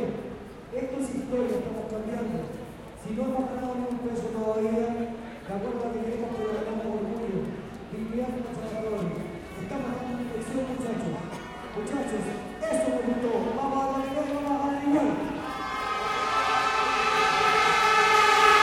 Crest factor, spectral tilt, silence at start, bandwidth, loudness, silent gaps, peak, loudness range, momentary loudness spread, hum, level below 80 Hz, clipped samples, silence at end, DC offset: 22 dB; -4.5 dB/octave; 0 s; 16.5 kHz; -27 LUFS; none; -6 dBFS; 8 LU; 15 LU; none; -52 dBFS; under 0.1%; 0 s; under 0.1%